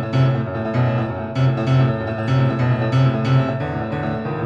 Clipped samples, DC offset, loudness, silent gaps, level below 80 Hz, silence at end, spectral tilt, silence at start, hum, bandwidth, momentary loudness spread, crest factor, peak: under 0.1%; under 0.1%; -19 LUFS; none; -46 dBFS; 0 s; -8.5 dB/octave; 0 s; none; 6.4 kHz; 6 LU; 12 dB; -6 dBFS